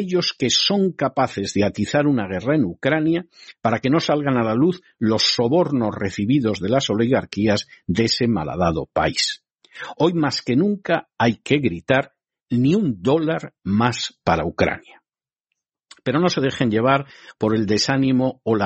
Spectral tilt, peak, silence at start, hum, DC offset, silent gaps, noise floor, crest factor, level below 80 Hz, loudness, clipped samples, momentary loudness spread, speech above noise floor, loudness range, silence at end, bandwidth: -5 dB/octave; -2 dBFS; 0 s; none; under 0.1%; none; -89 dBFS; 18 dB; -50 dBFS; -20 LUFS; under 0.1%; 6 LU; 69 dB; 3 LU; 0 s; 8.4 kHz